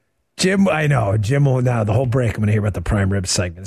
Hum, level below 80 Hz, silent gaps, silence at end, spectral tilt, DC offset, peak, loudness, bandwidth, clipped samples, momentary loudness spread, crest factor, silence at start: none; -36 dBFS; none; 0 s; -5.5 dB/octave; under 0.1%; -6 dBFS; -18 LUFS; 13.5 kHz; under 0.1%; 4 LU; 12 dB; 0.4 s